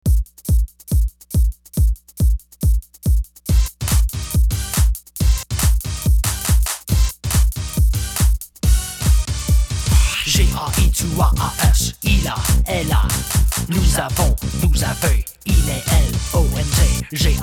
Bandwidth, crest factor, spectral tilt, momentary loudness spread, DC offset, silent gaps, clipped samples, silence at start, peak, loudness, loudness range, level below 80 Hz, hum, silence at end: 18 kHz; 14 dB; -4.5 dB/octave; 4 LU; under 0.1%; none; under 0.1%; 0.05 s; -2 dBFS; -19 LUFS; 3 LU; -18 dBFS; none; 0 s